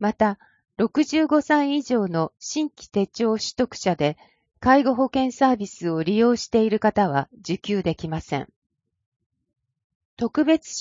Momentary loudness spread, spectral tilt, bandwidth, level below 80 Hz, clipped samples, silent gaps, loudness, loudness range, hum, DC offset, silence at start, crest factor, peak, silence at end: 10 LU; -5.5 dB/octave; 7.6 kHz; -54 dBFS; under 0.1%; 8.56-8.62 s, 9.06-9.20 s, 9.26-9.30 s, 9.84-10.17 s; -22 LUFS; 6 LU; none; under 0.1%; 0 s; 18 dB; -4 dBFS; 0 s